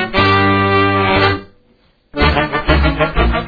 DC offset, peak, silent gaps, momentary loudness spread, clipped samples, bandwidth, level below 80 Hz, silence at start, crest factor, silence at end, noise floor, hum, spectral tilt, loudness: under 0.1%; 0 dBFS; none; 5 LU; under 0.1%; 5 kHz; -22 dBFS; 0 s; 14 dB; 0 s; -54 dBFS; none; -8 dB/octave; -13 LUFS